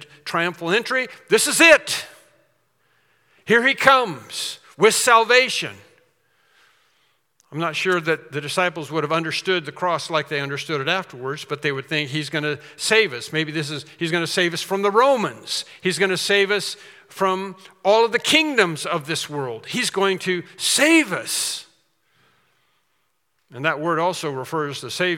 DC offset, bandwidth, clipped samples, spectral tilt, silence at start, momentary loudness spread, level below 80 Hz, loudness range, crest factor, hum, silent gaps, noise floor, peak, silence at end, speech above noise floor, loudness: under 0.1%; 18 kHz; under 0.1%; -3 dB/octave; 0 s; 13 LU; -68 dBFS; 6 LU; 22 dB; none; none; -71 dBFS; 0 dBFS; 0 s; 50 dB; -20 LUFS